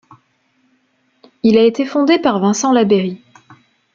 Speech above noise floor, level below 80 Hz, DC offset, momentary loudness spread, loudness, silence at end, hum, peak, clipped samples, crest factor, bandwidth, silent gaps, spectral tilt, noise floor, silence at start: 48 dB; -58 dBFS; under 0.1%; 6 LU; -14 LUFS; 0.8 s; none; -2 dBFS; under 0.1%; 16 dB; 7.6 kHz; none; -5 dB/octave; -61 dBFS; 1.45 s